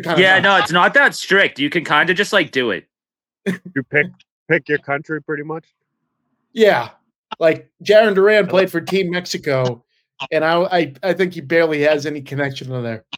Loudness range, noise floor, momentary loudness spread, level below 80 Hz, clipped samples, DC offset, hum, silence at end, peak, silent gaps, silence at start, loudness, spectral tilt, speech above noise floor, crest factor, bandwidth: 6 LU; under -90 dBFS; 13 LU; -64 dBFS; under 0.1%; under 0.1%; none; 0 s; 0 dBFS; 4.31-4.46 s, 7.16-7.24 s; 0 s; -16 LUFS; -5 dB/octave; over 73 dB; 18 dB; 16.5 kHz